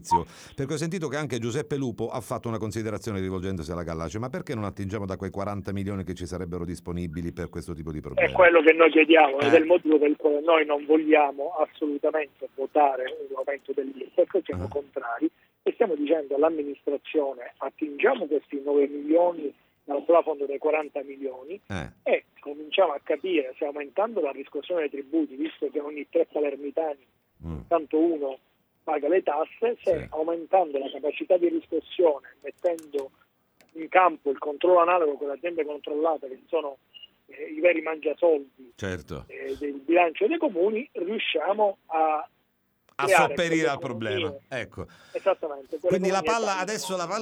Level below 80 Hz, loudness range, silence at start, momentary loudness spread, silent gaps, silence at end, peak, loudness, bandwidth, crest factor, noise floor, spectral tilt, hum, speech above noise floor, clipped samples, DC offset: -56 dBFS; 10 LU; 0 s; 14 LU; none; 0 s; -2 dBFS; -26 LUFS; 15 kHz; 22 dB; -71 dBFS; -5.5 dB/octave; none; 46 dB; under 0.1%; under 0.1%